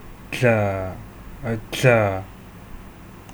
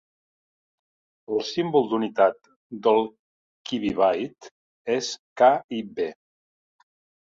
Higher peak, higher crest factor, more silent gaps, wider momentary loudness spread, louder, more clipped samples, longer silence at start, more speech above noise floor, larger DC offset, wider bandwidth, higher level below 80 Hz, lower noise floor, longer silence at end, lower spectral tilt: first, -2 dBFS vs -6 dBFS; about the same, 22 dB vs 20 dB; second, none vs 2.56-2.70 s, 3.19-3.65 s, 4.51-4.85 s, 5.19-5.36 s, 5.64-5.69 s; first, 25 LU vs 13 LU; first, -21 LUFS vs -24 LUFS; neither; second, 0 s vs 1.3 s; second, 21 dB vs over 67 dB; neither; first, over 20 kHz vs 7.8 kHz; first, -44 dBFS vs -64 dBFS; second, -41 dBFS vs under -90 dBFS; second, 0 s vs 1.1 s; about the same, -6 dB/octave vs -5 dB/octave